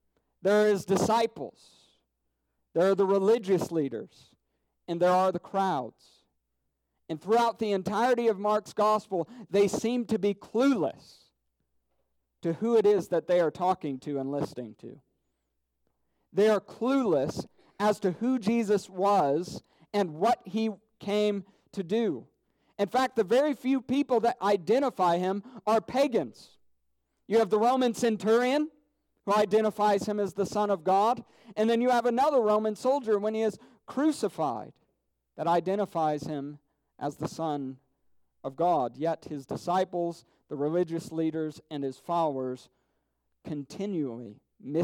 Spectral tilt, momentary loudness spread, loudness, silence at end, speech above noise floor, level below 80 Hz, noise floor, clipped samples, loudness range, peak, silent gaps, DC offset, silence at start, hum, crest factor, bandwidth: -6 dB/octave; 13 LU; -28 LUFS; 0 s; 52 dB; -70 dBFS; -80 dBFS; under 0.1%; 6 LU; -14 dBFS; none; under 0.1%; 0.45 s; none; 14 dB; 16 kHz